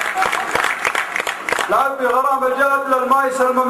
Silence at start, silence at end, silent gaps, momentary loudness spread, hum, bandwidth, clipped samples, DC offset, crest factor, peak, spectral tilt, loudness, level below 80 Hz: 0 s; 0 s; none; 5 LU; none; 15 kHz; under 0.1%; under 0.1%; 14 dB; -4 dBFS; -2 dB/octave; -17 LUFS; -56 dBFS